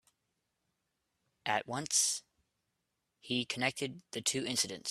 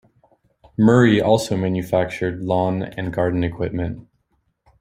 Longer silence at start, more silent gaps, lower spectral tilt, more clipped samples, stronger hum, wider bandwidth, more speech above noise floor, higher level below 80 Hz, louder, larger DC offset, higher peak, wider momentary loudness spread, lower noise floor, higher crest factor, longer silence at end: first, 1.45 s vs 0.8 s; neither; second, -1.5 dB/octave vs -7 dB/octave; neither; neither; about the same, 15.5 kHz vs 15.5 kHz; about the same, 49 dB vs 49 dB; second, -78 dBFS vs -48 dBFS; second, -34 LUFS vs -20 LUFS; neither; second, -16 dBFS vs -2 dBFS; about the same, 11 LU vs 12 LU; first, -84 dBFS vs -68 dBFS; about the same, 22 dB vs 18 dB; second, 0 s vs 0.8 s